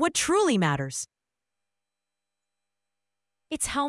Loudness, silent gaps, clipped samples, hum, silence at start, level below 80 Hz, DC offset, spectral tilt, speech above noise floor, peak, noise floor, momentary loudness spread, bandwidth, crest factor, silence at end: -25 LUFS; none; under 0.1%; none; 0 s; -58 dBFS; under 0.1%; -4 dB/octave; 63 dB; -10 dBFS; -88 dBFS; 14 LU; 12 kHz; 18 dB; 0 s